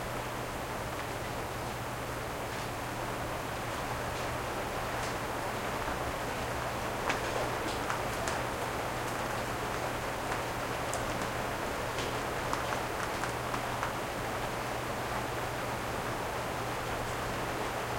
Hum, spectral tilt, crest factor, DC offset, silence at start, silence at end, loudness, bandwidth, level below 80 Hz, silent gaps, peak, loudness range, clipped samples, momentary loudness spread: none; -4 dB/octave; 22 dB; under 0.1%; 0 s; 0 s; -35 LUFS; 16.5 kHz; -48 dBFS; none; -12 dBFS; 2 LU; under 0.1%; 3 LU